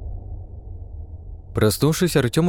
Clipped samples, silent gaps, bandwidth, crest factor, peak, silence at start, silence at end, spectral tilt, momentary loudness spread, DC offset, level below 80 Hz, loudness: under 0.1%; none; 18 kHz; 18 dB; -4 dBFS; 0 s; 0 s; -5.5 dB/octave; 20 LU; 0.2%; -36 dBFS; -20 LUFS